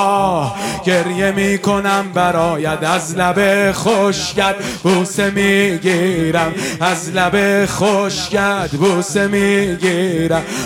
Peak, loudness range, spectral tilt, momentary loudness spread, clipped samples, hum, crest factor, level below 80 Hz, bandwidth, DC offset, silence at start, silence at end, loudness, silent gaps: 0 dBFS; 1 LU; -4.5 dB/octave; 4 LU; under 0.1%; none; 14 dB; -42 dBFS; 16.5 kHz; under 0.1%; 0 s; 0 s; -15 LUFS; none